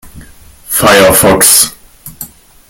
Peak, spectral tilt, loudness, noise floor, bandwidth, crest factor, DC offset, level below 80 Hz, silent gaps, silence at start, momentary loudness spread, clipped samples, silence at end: 0 dBFS; -2 dB/octave; -6 LUFS; -35 dBFS; over 20 kHz; 10 dB; under 0.1%; -36 dBFS; none; 0.05 s; 22 LU; 1%; 0.45 s